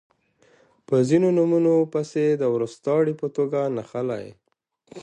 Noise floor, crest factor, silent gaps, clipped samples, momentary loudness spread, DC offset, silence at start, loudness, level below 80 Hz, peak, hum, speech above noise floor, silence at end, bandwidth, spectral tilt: -62 dBFS; 16 dB; none; under 0.1%; 10 LU; under 0.1%; 0.9 s; -22 LUFS; -68 dBFS; -6 dBFS; none; 41 dB; 0 s; 9.4 kHz; -8 dB/octave